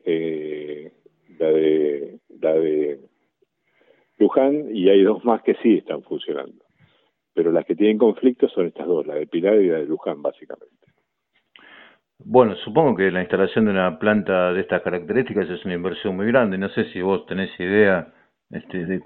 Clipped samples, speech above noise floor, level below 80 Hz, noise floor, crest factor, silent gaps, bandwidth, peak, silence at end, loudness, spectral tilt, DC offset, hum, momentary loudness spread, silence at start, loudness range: under 0.1%; 50 dB; -62 dBFS; -70 dBFS; 20 dB; none; 4.2 kHz; 0 dBFS; 0.05 s; -20 LUFS; -10.5 dB/octave; under 0.1%; none; 13 LU; 0.05 s; 4 LU